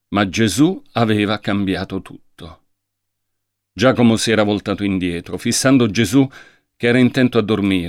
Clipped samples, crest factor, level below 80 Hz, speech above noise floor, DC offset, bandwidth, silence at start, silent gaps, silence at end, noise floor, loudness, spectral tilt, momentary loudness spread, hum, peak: under 0.1%; 14 dB; -50 dBFS; 59 dB; under 0.1%; 15.5 kHz; 0.1 s; none; 0 s; -75 dBFS; -17 LUFS; -5 dB/octave; 8 LU; none; -2 dBFS